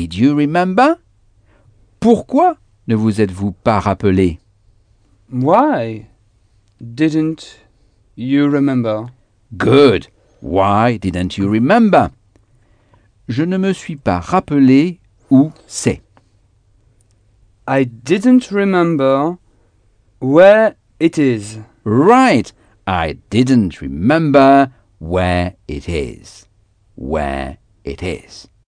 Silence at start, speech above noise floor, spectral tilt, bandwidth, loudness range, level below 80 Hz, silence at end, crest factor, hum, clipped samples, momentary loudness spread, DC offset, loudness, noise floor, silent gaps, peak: 0 s; 41 dB; -7 dB/octave; 10 kHz; 6 LU; -40 dBFS; 0.35 s; 16 dB; none; under 0.1%; 17 LU; under 0.1%; -14 LUFS; -54 dBFS; none; 0 dBFS